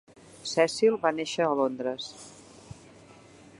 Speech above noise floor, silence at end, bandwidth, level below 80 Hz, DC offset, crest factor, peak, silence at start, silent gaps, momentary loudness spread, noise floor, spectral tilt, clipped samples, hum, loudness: 26 dB; 0.85 s; 11.5 kHz; -68 dBFS; under 0.1%; 20 dB; -10 dBFS; 0.35 s; none; 25 LU; -52 dBFS; -4 dB/octave; under 0.1%; none; -27 LUFS